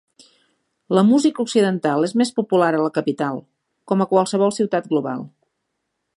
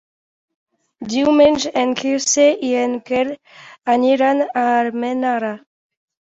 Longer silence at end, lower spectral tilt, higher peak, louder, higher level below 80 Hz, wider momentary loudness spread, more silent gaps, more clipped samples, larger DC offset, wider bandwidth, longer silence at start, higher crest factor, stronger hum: first, 0.9 s vs 0.75 s; first, -6 dB/octave vs -2.5 dB/octave; about the same, -2 dBFS vs -2 dBFS; about the same, -19 LUFS vs -17 LUFS; second, -72 dBFS vs -58 dBFS; second, 9 LU vs 12 LU; neither; neither; neither; first, 11.5 kHz vs 8.2 kHz; about the same, 0.9 s vs 1 s; about the same, 18 dB vs 16 dB; neither